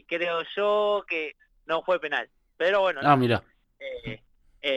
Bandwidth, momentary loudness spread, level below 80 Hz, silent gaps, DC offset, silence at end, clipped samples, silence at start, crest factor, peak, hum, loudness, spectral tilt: 12.5 kHz; 17 LU; -60 dBFS; none; under 0.1%; 0 s; under 0.1%; 0.1 s; 20 dB; -6 dBFS; none; -26 LUFS; -6.5 dB/octave